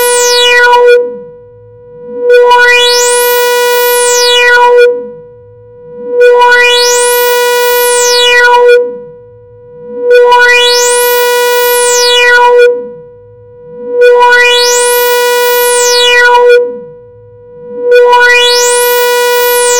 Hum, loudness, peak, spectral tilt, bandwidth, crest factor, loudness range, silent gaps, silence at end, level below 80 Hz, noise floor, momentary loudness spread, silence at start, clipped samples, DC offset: none; -5 LUFS; 0 dBFS; 1.5 dB/octave; 17.5 kHz; 6 dB; 2 LU; none; 0 s; -46 dBFS; -33 dBFS; 13 LU; 0 s; 0.9%; 1%